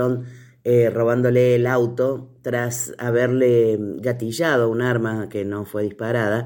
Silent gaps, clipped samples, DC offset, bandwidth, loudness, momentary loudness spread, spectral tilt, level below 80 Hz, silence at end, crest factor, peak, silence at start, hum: none; under 0.1%; under 0.1%; 17 kHz; -20 LUFS; 10 LU; -6.5 dB/octave; -60 dBFS; 0 s; 14 dB; -6 dBFS; 0 s; none